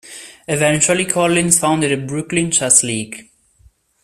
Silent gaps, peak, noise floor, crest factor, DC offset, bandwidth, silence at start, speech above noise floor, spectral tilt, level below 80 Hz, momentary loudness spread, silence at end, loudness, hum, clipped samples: none; 0 dBFS; -53 dBFS; 18 dB; under 0.1%; 16 kHz; 0.05 s; 37 dB; -3 dB/octave; -52 dBFS; 18 LU; 0.8 s; -15 LUFS; none; under 0.1%